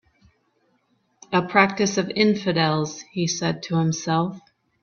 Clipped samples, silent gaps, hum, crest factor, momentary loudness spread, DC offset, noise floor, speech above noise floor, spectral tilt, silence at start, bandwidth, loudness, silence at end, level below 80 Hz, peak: under 0.1%; none; none; 22 dB; 8 LU; under 0.1%; -67 dBFS; 45 dB; -4.5 dB/octave; 1.3 s; 7.2 kHz; -22 LUFS; 0.45 s; -62 dBFS; 0 dBFS